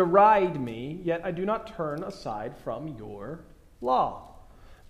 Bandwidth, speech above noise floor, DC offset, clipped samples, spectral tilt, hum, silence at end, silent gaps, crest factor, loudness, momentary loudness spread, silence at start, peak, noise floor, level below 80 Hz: 12 kHz; 23 dB; under 0.1%; under 0.1%; -7.5 dB/octave; none; 0.15 s; none; 22 dB; -27 LUFS; 20 LU; 0 s; -6 dBFS; -50 dBFS; -54 dBFS